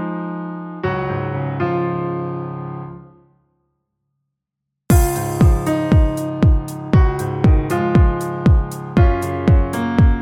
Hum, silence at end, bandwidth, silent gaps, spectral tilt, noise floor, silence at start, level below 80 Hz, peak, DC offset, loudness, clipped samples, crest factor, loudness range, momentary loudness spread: none; 0 s; 17 kHz; none; -7.5 dB/octave; -80 dBFS; 0 s; -22 dBFS; -2 dBFS; under 0.1%; -18 LUFS; under 0.1%; 16 dB; 9 LU; 11 LU